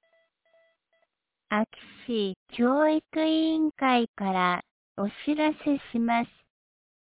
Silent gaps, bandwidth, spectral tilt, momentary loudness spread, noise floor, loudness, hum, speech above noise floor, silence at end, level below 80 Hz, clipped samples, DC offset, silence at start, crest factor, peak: 2.36-2.46 s, 4.08-4.14 s, 4.71-4.95 s; 4 kHz; -3.5 dB/octave; 10 LU; -77 dBFS; -27 LUFS; none; 51 dB; 0.75 s; -68 dBFS; under 0.1%; under 0.1%; 1.5 s; 16 dB; -12 dBFS